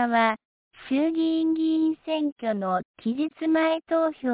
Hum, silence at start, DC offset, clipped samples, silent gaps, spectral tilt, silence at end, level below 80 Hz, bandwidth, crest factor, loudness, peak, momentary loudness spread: none; 0 s; under 0.1%; under 0.1%; 0.45-0.71 s, 2.32-2.36 s, 2.85-2.94 s; -9.5 dB/octave; 0 s; -68 dBFS; 4 kHz; 16 dB; -25 LUFS; -10 dBFS; 6 LU